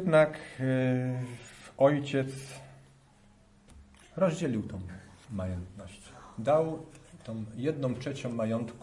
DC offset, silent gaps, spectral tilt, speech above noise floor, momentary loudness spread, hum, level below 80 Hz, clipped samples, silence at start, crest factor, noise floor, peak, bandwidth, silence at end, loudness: under 0.1%; none; -7 dB/octave; 30 dB; 21 LU; none; -62 dBFS; under 0.1%; 0 s; 20 dB; -60 dBFS; -12 dBFS; 11.5 kHz; 0 s; -31 LUFS